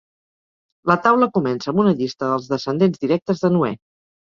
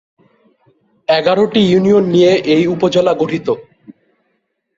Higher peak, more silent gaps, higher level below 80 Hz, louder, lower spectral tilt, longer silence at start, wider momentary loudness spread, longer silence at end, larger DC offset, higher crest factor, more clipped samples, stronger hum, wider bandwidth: about the same, -2 dBFS vs 0 dBFS; first, 3.22-3.26 s vs none; second, -60 dBFS vs -54 dBFS; second, -19 LUFS vs -13 LUFS; about the same, -7.5 dB/octave vs -6.5 dB/octave; second, 0.85 s vs 1.1 s; about the same, 7 LU vs 9 LU; second, 0.55 s vs 0.85 s; neither; about the same, 18 dB vs 14 dB; neither; neither; about the same, 7.2 kHz vs 7.8 kHz